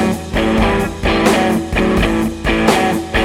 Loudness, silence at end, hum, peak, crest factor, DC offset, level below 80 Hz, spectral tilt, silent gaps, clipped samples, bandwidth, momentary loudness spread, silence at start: -15 LUFS; 0 s; none; 0 dBFS; 14 dB; under 0.1%; -24 dBFS; -5 dB/octave; none; under 0.1%; 16.5 kHz; 4 LU; 0 s